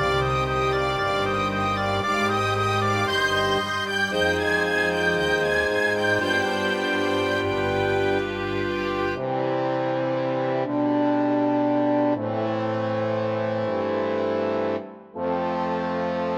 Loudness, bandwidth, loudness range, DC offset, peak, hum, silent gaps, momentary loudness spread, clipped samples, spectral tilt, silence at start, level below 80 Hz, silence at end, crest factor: -23 LUFS; 16 kHz; 3 LU; under 0.1%; -10 dBFS; none; none; 4 LU; under 0.1%; -5.5 dB/octave; 0 s; -48 dBFS; 0 s; 14 dB